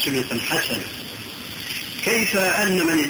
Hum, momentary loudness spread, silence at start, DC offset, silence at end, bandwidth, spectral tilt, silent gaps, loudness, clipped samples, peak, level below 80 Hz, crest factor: none; 14 LU; 0 s; under 0.1%; 0 s; over 20 kHz; -3 dB/octave; none; -22 LUFS; under 0.1%; -8 dBFS; -54 dBFS; 14 dB